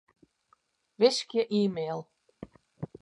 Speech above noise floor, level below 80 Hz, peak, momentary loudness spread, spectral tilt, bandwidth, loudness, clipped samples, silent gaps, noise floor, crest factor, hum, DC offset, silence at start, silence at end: 43 dB; -70 dBFS; -10 dBFS; 25 LU; -5 dB/octave; 11.5 kHz; -28 LUFS; under 0.1%; none; -70 dBFS; 22 dB; none; under 0.1%; 1 s; 0.15 s